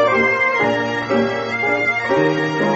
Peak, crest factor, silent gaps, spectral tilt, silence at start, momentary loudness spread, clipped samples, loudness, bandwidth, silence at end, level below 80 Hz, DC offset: -4 dBFS; 14 dB; none; -3.5 dB/octave; 0 s; 5 LU; under 0.1%; -17 LUFS; 8 kHz; 0 s; -56 dBFS; under 0.1%